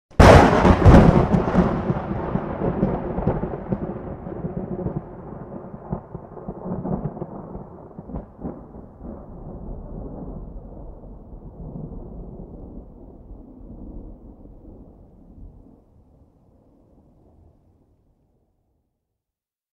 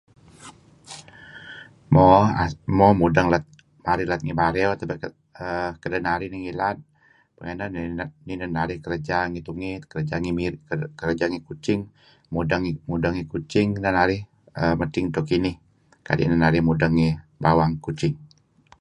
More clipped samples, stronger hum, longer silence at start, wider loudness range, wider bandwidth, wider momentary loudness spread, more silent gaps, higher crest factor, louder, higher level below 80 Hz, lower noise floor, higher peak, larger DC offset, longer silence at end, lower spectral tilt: neither; neither; second, 0.2 s vs 0.4 s; first, 25 LU vs 9 LU; first, 12.5 kHz vs 11 kHz; first, 28 LU vs 17 LU; neither; about the same, 22 dB vs 22 dB; first, -19 LUFS vs -23 LUFS; first, -30 dBFS vs -44 dBFS; first, -89 dBFS vs -60 dBFS; about the same, 0 dBFS vs -2 dBFS; neither; first, 4.25 s vs 0.55 s; about the same, -7.5 dB/octave vs -7.5 dB/octave